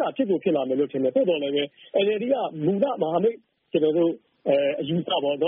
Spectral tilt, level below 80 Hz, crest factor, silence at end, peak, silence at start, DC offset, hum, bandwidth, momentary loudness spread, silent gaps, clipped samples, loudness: -4.5 dB/octave; -70 dBFS; 14 dB; 0 s; -8 dBFS; 0 s; under 0.1%; none; 4 kHz; 5 LU; none; under 0.1%; -24 LUFS